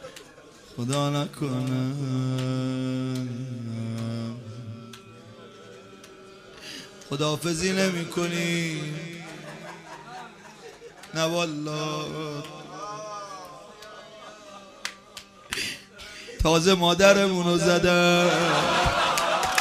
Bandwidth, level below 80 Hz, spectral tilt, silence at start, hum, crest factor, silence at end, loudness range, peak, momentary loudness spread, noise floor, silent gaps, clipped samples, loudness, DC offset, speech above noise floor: 15.5 kHz; -48 dBFS; -4.5 dB/octave; 0 s; none; 22 dB; 0 s; 16 LU; -4 dBFS; 25 LU; -49 dBFS; none; under 0.1%; -25 LUFS; under 0.1%; 25 dB